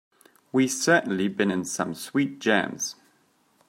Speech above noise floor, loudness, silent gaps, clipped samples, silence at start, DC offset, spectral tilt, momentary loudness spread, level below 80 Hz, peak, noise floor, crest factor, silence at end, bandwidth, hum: 40 dB; -25 LUFS; none; under 0.1%; 0.55 s; under 0.1%; -4 dB/octave; 8 LU; -72 dBFS; -4 dBFS; -65 dBFS; 22 dB; 0.75 s; 16 kHz; none